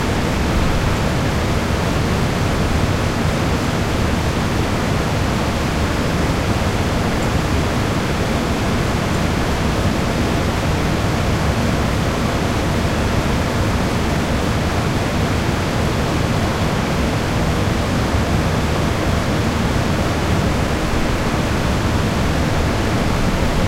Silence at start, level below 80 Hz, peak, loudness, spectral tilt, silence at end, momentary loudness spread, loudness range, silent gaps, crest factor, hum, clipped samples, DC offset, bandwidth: 0 s; -26 dBFS; -4 dBFS; -18 LUFS; -5.5 dB/octave; 0 s; 1 LU; 0 LU; none; 14 dB; none; under 0.1%; under 0.1%; 16.5 kHz